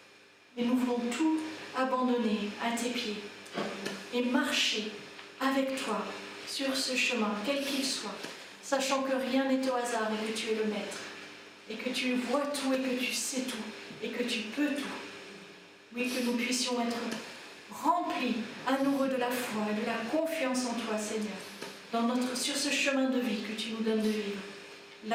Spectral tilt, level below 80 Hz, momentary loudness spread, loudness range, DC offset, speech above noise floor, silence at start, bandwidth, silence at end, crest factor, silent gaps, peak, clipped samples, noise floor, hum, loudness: -3 dB/octave; -80 dBFS; 14 LU; 2 LU; under 0.1%; 26 dB; 0 s; 16.5 kHz; 0 s; 18 dB; none; -14 dBFS; under 0.1%; -58 dBFS; none; -32 LUFS